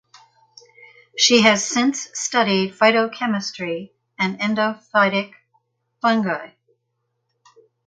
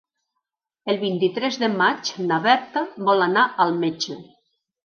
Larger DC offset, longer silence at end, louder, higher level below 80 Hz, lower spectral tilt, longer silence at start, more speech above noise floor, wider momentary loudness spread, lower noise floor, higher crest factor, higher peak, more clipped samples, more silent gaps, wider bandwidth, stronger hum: neither; first, 1.4 s vs 0.6 s; about the same, -19 LUFS vs -21 LUFS; first, -68 dBFS vs -76 dBFS; second, -3 dB/octave vs -4.5 dB/octave; first, 1.15 s vs 0.85 s; second, 55 dB vs 60 dB; first, 13 LU vs 10 LU; second, -74 dBFS vs -81 dBFS; about the same, 22 dB vs 18 dB; first, 0 dBFS vs -4 dBFS; neither; neither; first, 9.4 kHz vs 7 kHz; neither